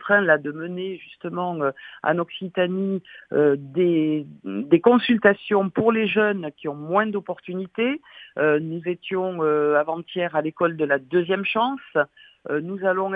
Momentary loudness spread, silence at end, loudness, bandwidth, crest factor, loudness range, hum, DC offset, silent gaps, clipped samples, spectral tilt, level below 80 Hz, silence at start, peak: 13 LU; 0 s; -23 LUFS; 4.8 kHz; 22 dB; 4 LU; none; under 0.1%; none; under 0.1%; -9 dB/octave; -70 dBFS; 0 s; 0 dBFS